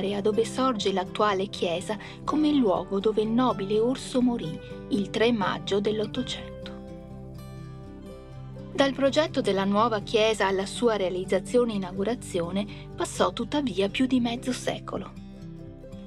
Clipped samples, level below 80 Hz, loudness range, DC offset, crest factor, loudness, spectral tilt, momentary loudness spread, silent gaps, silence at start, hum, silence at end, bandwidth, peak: under 0.1%; -50 dBFS; 5 LU; under 0.1%; 20 dB; -26 LUFS; -5 dB/octave; 18 LU; none; 0 s; none; 0 s; 13 kHz; -8 dBFS